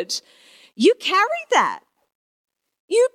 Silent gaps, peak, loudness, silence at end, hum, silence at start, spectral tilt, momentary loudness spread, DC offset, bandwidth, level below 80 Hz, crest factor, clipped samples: 2.15-2.48 s, 2.80-2.88 s; -4 dBFS; -19 LUFS; 0.05 s; none; 0 s; -2 dB/octave; 10 LU; under 0.1%; 15 kHz; -82 dBFS; 18 dB; under 0.1%